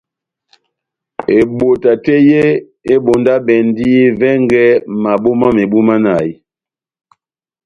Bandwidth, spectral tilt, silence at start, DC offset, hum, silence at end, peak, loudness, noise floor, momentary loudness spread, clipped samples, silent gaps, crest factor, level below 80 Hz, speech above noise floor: 9.6 kHz; -8 dB/octave; 1.2 s; under 0.1%; none; 1.3 s; 0 dBFS; -11 LUFS; -89 dBFS; 6 LU; under 0.1%; none; 12 dB; -48 dBFS; 79 dB